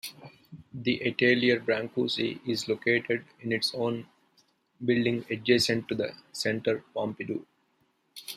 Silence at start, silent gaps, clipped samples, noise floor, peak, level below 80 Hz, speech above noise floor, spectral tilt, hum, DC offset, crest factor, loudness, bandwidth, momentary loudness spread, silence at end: 0.05 s; none; under 0.1%; -71 dBFS; -8 dBFS; -70 dBFS; 43 dB; -4.5 dB/octave; none; under 0.1%; 22 dB; -28 LUFS; 15.5 kHz; 12 LU; 0 s